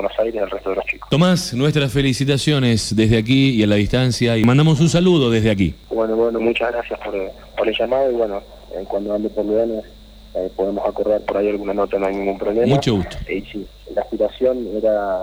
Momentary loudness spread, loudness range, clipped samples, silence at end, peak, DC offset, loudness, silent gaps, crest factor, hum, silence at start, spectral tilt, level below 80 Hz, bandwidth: 11 LU; 6 LU; under 0.1%; 0 s; -2 dBFS; under 0.1%; -18 LUFS; none; 16 dB; none; 0 s; -6 dB/octave; -40 dBFS; 19.5 kHz